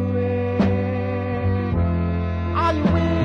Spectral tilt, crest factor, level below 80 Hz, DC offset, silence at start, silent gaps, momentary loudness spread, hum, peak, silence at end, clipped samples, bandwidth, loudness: -9 dB/octave; 14 dB; -38 dBFS; under 0.1%; 0 s; none; 4 LU; none; -6 dBFS; 0 s; under 0.1%; 6.4 kHz; -22 LUFS